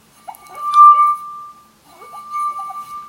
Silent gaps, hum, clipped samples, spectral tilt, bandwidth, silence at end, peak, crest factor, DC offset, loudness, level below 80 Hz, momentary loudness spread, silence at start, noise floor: none; none; under 0.1%; -1 dB/octave; 16.5 kHz; 0.05 s; 0 dBFS; 16 dB; under 0.1%; -12 LUFS; -68 dBFS; 25 LU; 0.55 s; -46 dBFS